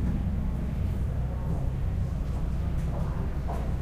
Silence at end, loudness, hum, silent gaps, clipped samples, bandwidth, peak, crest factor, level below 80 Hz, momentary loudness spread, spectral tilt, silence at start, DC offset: 0 s; -31 LUFS; none; none; under 0.1%; 10.5 kHz; -18 dBFS; 12 dB; -30 dBFS; 2 LU; -8.5 dB/octave; 0 s; under 0.1%